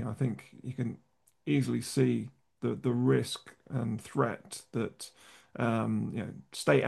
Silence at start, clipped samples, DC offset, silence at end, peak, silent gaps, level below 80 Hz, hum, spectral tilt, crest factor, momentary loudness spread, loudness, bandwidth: 0 s; under 0.1%; under 0.1%; 0 s; -10 dBFS; none; -70 dBFS; none; -6.5 dB/octave; 22 dB; 14 LU; -33 LUFS; 12.5 kHz